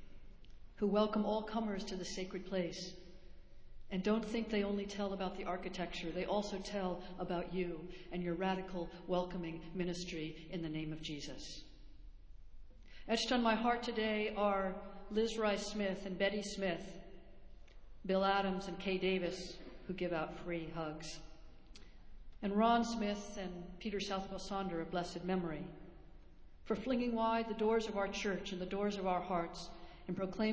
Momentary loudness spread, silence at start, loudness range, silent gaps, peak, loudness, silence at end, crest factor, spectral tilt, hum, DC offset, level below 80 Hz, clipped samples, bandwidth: 13 LU; 0 s; 5 LU; none; -20 dBFS; -39 LUFS; 0 s; 20 dB; -5 dB/octave; none; under 0.1%; -58 dBFS; under 0.1%; 8 kHz